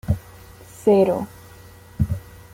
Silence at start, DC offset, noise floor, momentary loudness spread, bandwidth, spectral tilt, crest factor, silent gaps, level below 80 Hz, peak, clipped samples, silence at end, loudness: 0.05 s; under 0.1%; -44 dBFS; 22 LU; 16.5 kHz; -8 dB/octave; 18 dB; none; -40 dBFS; -6 dBFS; under 0.1%; 0.35 s; -22 LUFS